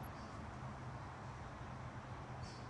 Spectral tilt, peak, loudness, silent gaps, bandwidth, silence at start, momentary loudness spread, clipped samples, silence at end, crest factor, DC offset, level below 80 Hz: -6 dB/octave; -38 dBFS; -50 LUFS; none; 11 kHz; 0 s; 1 LU; under 0.1%; 0 s; 12 dB; under 0.1%; -60 dBFS